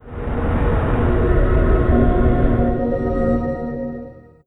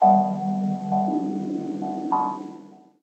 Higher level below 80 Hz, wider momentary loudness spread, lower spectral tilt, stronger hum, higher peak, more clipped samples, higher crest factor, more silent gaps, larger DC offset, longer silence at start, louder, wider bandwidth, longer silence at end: first, -20 dBFS vs -80 dBFS; about the same, 10 LU vs 11 LU; about the same, -10.5 dB/octave vs -9.5 dB/octave; neither; about the same, -4 dBFS vs -6 dBFS; neither; about the same, 14 dB vs 18 dB; neither; neither; about the same, 0.05 s vs 0 s; first, -19 LUFS vs -25 LUFS; second, 4 kHz vs 8.2 kHz; about the same, 0.25 s vs 0.25 s